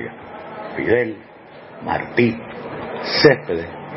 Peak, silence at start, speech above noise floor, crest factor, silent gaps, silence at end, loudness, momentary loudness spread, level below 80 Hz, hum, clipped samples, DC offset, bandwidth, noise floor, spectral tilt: 0 dBFS; 0 s; 22 dB; 22 dB; none; 0 s; -19 LUFS; 19 LU; -52 dBFS; none; under 0.1%; under 0.1%; 6 kHz; -40 dBFS; -8.5 dB/octave